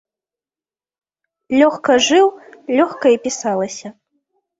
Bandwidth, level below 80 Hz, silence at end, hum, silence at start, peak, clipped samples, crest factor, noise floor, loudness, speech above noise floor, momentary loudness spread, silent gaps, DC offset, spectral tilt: 8 kHz; -62 dBFS; 0.7 s; none; 1.5 s; -2 dBFS; under 0.1%; 16 dB; under -90 dBFS; -16 LUFS; over 75 dB; 15 LU; none; under 0.1%; -3 dB/octave